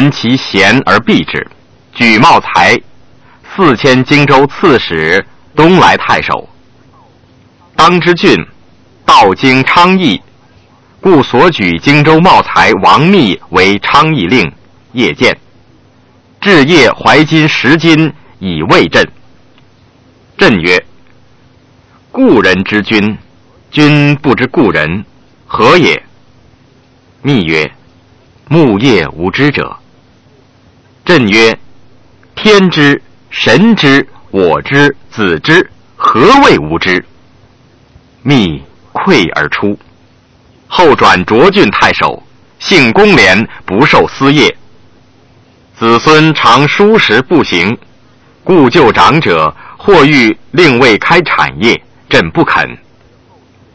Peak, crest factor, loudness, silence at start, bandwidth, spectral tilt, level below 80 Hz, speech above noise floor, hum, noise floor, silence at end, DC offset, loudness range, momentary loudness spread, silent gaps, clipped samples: 0 dBFS; 8 dB; -7 LUFS; 0 s; 8 kHz; -5.5 dB/octave; -38 dBFS; 37 dB; none; -44 dBFS; 1 s; under 0.1%; 5 LU; 11 LU; none; 3%